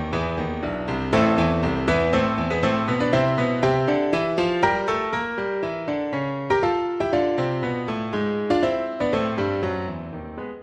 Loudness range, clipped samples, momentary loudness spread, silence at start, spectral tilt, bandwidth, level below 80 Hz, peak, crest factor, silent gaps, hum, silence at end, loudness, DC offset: 3 LU; under 0.1%; 7 LU; 0 s; -7 dB/octave; 9.8 kHz; -42 dBFS; -6 dBFS; 18 dB; none; none; 0 s; -23 LUFS; under 0.1%